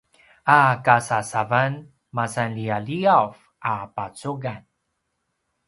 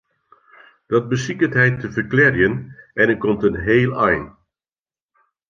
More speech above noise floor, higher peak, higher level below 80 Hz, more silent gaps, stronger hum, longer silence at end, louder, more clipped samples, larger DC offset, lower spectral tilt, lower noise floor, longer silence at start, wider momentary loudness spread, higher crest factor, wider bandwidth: second, 54 dB vs over 72 dB; about the same, 0 dBFS vs -2 dBFS; second, -62 dBFS vs -46 dBFS; neither; neither; about the same, 1.1 s vs 1.2 s; second, -22 LUFS vs -18 LUFS; neither; neither; second, -5.5 dB/octave vs -7 dB/octave; second, -75 dBFS vs under -90 dBFS; second, 0.45 s vs 0.9 s; first, 15 LU vs 8 LU; about the same, 22 dB vs 18 dB; first, 11.5 kHz vs 7.4 kHz